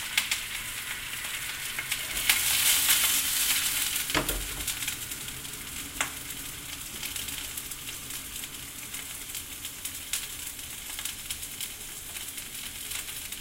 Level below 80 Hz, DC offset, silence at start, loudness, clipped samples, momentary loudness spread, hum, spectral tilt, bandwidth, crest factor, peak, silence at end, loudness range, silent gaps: -50 dBFS; under 0.1%; 0 s; -29 LUFS; under 0.1%; 14 LU; none; 0 dB/octave; 17 kHz; 28 dB; -4 dBFS; 0 s; 11 LU; none